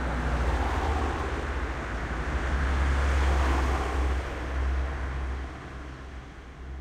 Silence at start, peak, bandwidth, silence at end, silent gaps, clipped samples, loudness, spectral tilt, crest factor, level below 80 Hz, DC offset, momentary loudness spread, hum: 0 s; -14 dBFS; 9.8 kHz; 0 s; none; under 0.1%; -29 LUFS; -6 dB/octave; 14 dB; -30 dBFS; under 0.1%; 15 LU; none